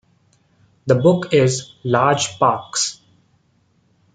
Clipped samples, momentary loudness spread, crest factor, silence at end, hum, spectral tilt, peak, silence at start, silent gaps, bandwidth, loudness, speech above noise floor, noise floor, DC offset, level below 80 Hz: under 0.1%; 7 LU; 18 dB; 1.2 s; none; -4.5 dB/octave; 0 dBFS; 0.85 s; none; 9.6 kHz; -18 LUFS; 44 dB; -61 dBFS; under 0.1%; -60 dBFS